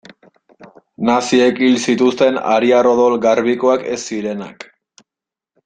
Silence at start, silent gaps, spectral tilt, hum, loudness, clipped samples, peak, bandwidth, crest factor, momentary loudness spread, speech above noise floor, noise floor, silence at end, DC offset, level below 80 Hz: 0.6 s; none; -4.5 dB/octave; none; -15 LUFS; under 0.1%; -2 dBFS; 9.4 kHz; 14 dB; 10 LU; 73 dB; -87 dBFS; 1.15 s; under 0.1%; -60 dBFS